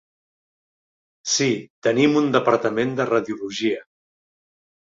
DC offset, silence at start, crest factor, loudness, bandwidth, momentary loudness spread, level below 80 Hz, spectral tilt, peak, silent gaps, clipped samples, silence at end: under 0.1%; 1.25 s; 20 dB; -21 LUFS; 7.8 kHz; 8 LU; -66 dBFS; -4 dB/octave; -2 dBFS; 1.70-1.82 s; under 0.1%; 1.05 s